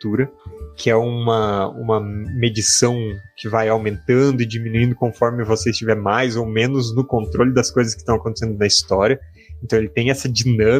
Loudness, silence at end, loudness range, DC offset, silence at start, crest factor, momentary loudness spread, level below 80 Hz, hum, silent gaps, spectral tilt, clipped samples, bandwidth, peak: -18 LUFS; 0 s; 1 LU; under 0.1%; 0.05 s; 18 dB; 8 LU; -40 dBFS; none; none; -4.5 dB/octave; under 0.1%; 15 kHz; 0 dBFS